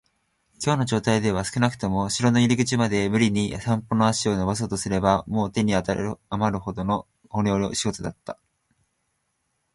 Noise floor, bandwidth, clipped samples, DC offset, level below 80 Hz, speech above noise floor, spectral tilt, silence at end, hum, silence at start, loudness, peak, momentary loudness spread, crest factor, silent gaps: -74 dBFS; 11.5 kHz; under 0.1%; under 0.1%; -48 dBFS; 51 dB; -5.5 dB/octave; 1.4 s; none; 0.6 s; -24 LUFS; -6 dBFS; 8 LU; 18 dB; none